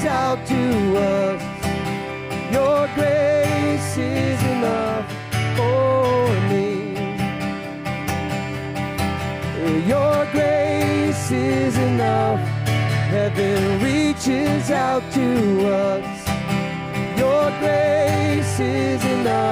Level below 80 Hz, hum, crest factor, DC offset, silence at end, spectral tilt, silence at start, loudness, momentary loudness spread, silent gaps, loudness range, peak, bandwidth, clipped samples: -48 dBFS; none; 10 dB; under 0.1%; 0 s; -6 dB/octave; 0 s; -20 LUFS; 7 LU; none; 3 LU; -8 dBFS; 16 kHz; under 0.1%